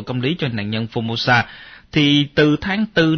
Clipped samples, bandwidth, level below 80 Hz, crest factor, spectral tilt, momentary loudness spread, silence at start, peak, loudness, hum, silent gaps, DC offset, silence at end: under 0.1%; 6.6 kHz; -46 dBFS; 16 dB; -6 dB/octave; 8 LU; 0 s; -4 dBFS; -18 LUFS; none; none; under 0.1%; 0 s